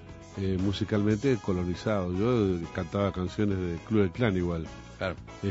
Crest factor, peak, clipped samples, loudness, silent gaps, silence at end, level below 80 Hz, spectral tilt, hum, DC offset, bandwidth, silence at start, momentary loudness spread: 18 dB; -10 dBFS; under 0.1%; -29 LUFS; none; 0 s; -48 dBFS; -7.5 dB/octave; none; under 0.1%; 8 kHz; 0 s; 9 LU